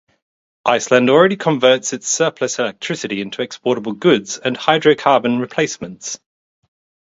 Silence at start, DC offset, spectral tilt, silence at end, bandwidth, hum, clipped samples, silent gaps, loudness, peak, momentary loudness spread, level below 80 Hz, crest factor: 0.65 s; under 0.1%; -3.5 dB/octave; 0.9 s; 8 kHz; none; under 0.1%; none; -16 LUFS; 0 dBFS; 11 LU; -62 dBFS; 18 dB